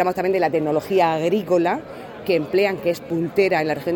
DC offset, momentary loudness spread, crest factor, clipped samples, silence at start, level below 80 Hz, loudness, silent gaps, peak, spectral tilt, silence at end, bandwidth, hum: under 0.1%; 6 LU; 16 dB; under 0.1%; 0 s; -58 dBFS; -20 LUFS; none; -4 dBFS; -6.5 dB/octave; 0 s; 17.5 kHz; none